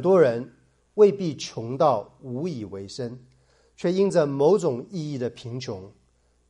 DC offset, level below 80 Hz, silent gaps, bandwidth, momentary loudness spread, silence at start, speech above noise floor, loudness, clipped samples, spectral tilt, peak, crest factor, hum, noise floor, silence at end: under 0.1%; -66 dBFS; none; 10.5 kHz; 16 LU; 0 s; 41 dB; -24 LUFS; under 0.1%; -6.5 dB/octave; -6 dBFS; 18 dB; none; -64 dBFS; 0.6 s